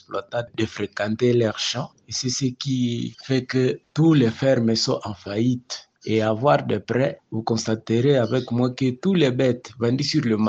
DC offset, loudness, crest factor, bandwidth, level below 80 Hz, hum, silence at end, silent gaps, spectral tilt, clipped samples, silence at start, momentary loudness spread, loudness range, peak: under 0.1%; -22 LUFS; 16 dB; 8.4 kHz; -60 dBFS; none; 0 s; none; -5.5 dB/octave; under 0.1%; 0.1 s; 9 LU; 2 LU; -6 dBFS